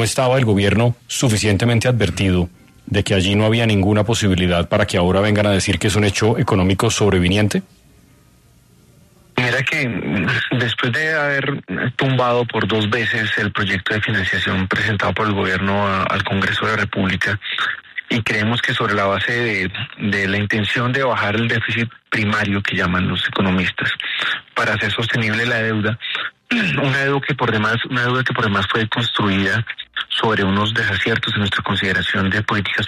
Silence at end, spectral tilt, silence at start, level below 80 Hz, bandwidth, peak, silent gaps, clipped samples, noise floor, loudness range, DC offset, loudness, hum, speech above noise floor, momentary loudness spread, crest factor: 0 s; -5 dB/octave; 0 s; -44 dBFS; 13.5 kHz; -2 dBFS; none; under 0.1%; -51 dBFS; 3 LU; under 0.1%; -18 LUFS; none; 33 dB; 5 LU; 16 dB